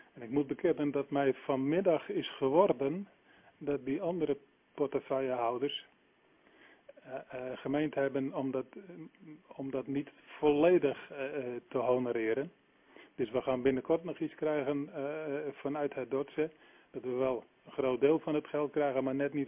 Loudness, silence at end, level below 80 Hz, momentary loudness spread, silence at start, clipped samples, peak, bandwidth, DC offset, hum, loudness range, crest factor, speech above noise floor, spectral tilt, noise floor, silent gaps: -34 LUFS; 0 s; -70 dBFS; 14 LU; 0.15 s; under 0.1%; -14 dBFS; 3.7 kHz; under 0.1%; none; 5 LU; 20 dB; 35 dB; -5 dB/octave; -68 dBFS; none